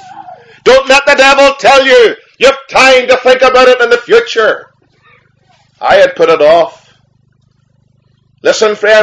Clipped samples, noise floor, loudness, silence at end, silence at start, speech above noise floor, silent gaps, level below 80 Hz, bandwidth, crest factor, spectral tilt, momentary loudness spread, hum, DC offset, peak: 3%; -52 dBFS; -7 LUFS; 0 s; 0.15 s; 46 dB; none; -42 dBFS; 11 kHz; 8 dB; -2 dB/octave; 8 LU; 50 Hz at -60 dBFS; under 0.1%; 0 dBFS